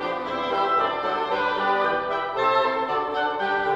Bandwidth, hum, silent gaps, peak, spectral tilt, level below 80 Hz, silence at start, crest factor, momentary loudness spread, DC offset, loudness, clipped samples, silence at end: 8.8 kHz; none; none; -8 dBFS; -5 dB/octave; -58 dBFS; 0 s; 14 dB; 4 LU; under 0.1%; -23 LUFS; under 0.1%; 0 s